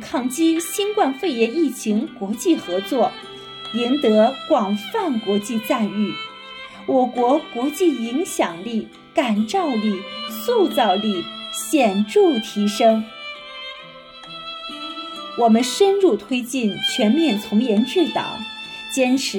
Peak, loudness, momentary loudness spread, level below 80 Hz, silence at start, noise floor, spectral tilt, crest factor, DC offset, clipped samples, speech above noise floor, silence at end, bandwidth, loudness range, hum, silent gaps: -4 dBFS; -20 LUFS; 15 LU; -64 dBFS; 0 s; -40 dBFS; -4.5 dB/octave; 16 dB; under 0.1%; under 0.1%; 21 dB; 0 s; 17.5 kHz; 3 LU; none; none